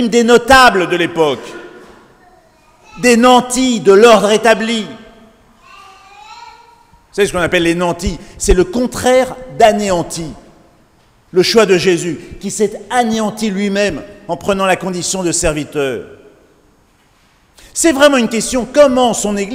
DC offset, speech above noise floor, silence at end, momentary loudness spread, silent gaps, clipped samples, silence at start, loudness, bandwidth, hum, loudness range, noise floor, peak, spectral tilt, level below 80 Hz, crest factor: under 0.1%; 40 dB; 0 s; 15 LU; none; 0.3%; 0 s; -12 LUFS; 16.5 kHz; none; 7 LU; -52 dBFS; 0 dBFS; -3.5 dB/octave; -34 dBFS; 14 dB